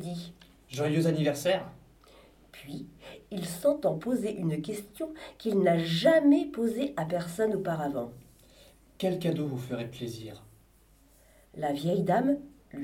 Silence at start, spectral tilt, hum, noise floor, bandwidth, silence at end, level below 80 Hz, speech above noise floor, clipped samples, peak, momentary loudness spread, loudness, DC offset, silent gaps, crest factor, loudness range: 0 s; -6.5 dB/octave; none; -61 dBFS; 17 kHz; 0 s; -62 dBFS; 32 dB; under 0.1%; -10 dBFS; 18 LU; -29 LUFS; under 0.1%; none; 20 dB; 8 LU